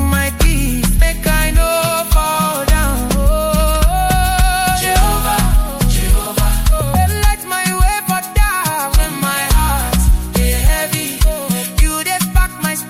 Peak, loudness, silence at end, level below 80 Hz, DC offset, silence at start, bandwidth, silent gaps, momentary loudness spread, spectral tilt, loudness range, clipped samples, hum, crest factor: 0 dBFS; -15 LUFS; 0 s; -16 dBFS; under 0.1%; 0 s; 16.5 kHz; none; 3 LU; -4 dB/octave; 1 LU; under 0.1%; none; 12 dB